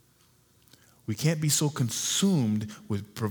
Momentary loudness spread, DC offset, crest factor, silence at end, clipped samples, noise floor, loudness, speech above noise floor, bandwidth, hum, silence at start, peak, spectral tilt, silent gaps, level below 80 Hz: 11 LU; under 0.1%; 18 dB; 0 s; under 0.1%; -63 dBFS; -27 LUFS; 36 dB; over 20 kHz; none; 1.1 s; -12 dBFS; -4.5 dB/octave; none; -68 dBFS